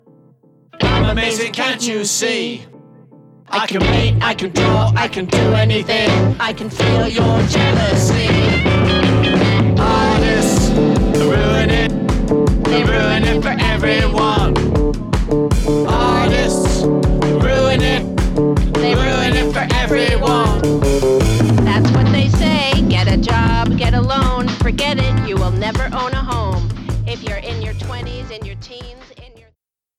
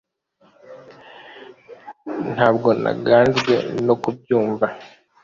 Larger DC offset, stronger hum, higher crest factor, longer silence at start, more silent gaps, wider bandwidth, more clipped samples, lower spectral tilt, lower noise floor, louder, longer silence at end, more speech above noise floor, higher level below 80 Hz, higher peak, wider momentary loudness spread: neither; neither; second, 10 dB vs 20 dB; about the same, 0.75 s vs 0.7 s; neither; first, 14 kHz vs 7.4 kHz; neither; about the same, -5.5 dB/octave vs -6.5 dB/octave; first, -63 dBFS vs -59 dBFS; first, -15 LUFS vs -19 LUFS; first, 0.7 s vs 0.35 s; first, 48 dB vs 41 dB; first, -22 dBFS vs -56 dBFS; about the same, -4 dBFS vs -2 dBFS; second, 7 LU vs 25 LU